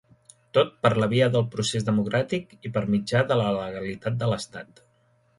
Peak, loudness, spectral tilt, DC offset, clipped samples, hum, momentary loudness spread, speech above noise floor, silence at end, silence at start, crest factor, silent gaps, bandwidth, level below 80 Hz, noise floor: -6 dBFS; -25 LUFS; -6 dB/octave; under 0.1%; under 0.1%; none; 10 LU; 40 dB; 0.75 s; 0.55 s; 20 dB; none; 11.5 kHz; -58 dBFS; -64 dBFS